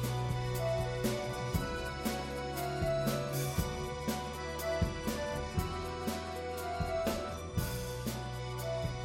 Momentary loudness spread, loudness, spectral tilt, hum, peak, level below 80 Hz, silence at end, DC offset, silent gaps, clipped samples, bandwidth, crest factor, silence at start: 5 LU; -36 LUFS; -5 dB/octave; none; -20 dBFS; -46 dBFS; 0 s; under 0.1%; none; under 0.1%; 16.5 kHz; 16 dB; 0 s